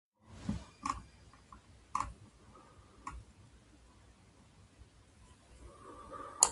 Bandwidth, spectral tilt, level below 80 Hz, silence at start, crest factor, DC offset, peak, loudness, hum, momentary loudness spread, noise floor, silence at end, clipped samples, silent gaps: 11.5 kHz; -2 dB/octave; -58 dBFS; 0.25 s; 38 dB; under 0.1%; -4 dBFS; -41 LUFS; none; 22 LU; -62 dBFS; 0 s; under 0.1%; none